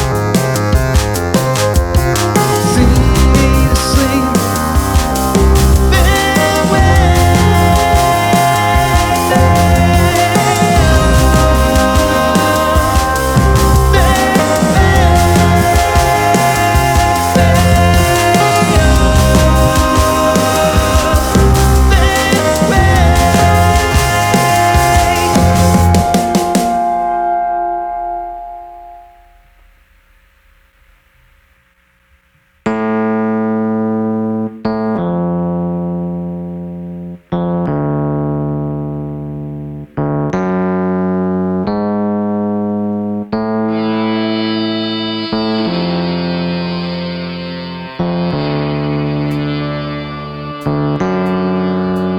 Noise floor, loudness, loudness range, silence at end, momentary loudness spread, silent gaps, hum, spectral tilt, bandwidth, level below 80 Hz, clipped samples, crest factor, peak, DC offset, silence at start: -54 dBFS; -12 LUFS; 9 LU; 0 s; 10 LU; none; none; -5.5 dB/octave; 20 kHz; -20 dBFS; under 0.1%; 12 dB; 0 dBFS; under 0.1%; 0 s